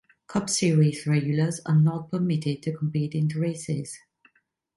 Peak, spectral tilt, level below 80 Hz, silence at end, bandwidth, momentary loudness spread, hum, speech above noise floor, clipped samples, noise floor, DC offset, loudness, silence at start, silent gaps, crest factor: -12 dBFS; -6 dB/octave; -64 dBFS; 0.8 s; 11.5 kHz; 9 LU; none; 44 dB; under 0.1%; -68 dBFS; under 0.1%; -25 LUFS; 0.3 s; none; 14 dB